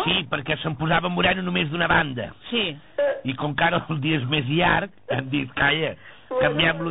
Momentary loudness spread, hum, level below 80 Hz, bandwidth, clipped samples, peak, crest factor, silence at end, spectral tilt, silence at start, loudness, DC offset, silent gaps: 8 LU; none; -46 dBFS; 4 kHz; under 0.1%; -6 dBFS; 16 dB; 0 s; -3 dB/octave; 0 s; -23 LUFS; 0.3%; none